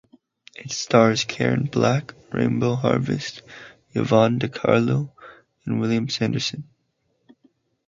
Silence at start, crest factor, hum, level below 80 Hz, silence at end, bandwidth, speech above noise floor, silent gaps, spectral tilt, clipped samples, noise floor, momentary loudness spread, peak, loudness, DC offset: 0.6 s; 22 dB; none; -58 dBFS; 1.25 s; 7.6 kHz; 50 dB; none; -5.5 dB/octave; under 0.1%; -71 dBFS; 17 LU; -2 dBFS; -22 LUFS; under 0.1%